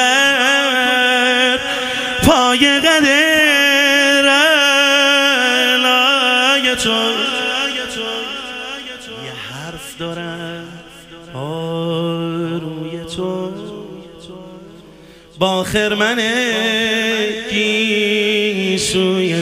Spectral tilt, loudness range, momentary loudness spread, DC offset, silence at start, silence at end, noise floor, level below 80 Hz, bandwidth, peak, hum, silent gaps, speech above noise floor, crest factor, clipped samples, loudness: -2.5 dB/octave; 15 LU; 17 LU; under 0.1%; 0 s; 0 s; -41 dBFS; -46 dBFS; 15.5 kHz; 0 dBFS; none; none; 26 dB; 16 dB; under 0.1%; -13 LUFS